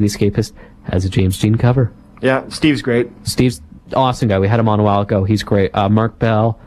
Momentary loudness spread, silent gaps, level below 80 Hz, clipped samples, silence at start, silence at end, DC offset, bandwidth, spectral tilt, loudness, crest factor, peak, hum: 7 LU; none; -38 dBFS; under 0.1%; 0 s; 0.1 s; under 0.1%; 14 kHz; -6.5 dB/octave; -16 LUFS; 14 dB; -2 dBFS; none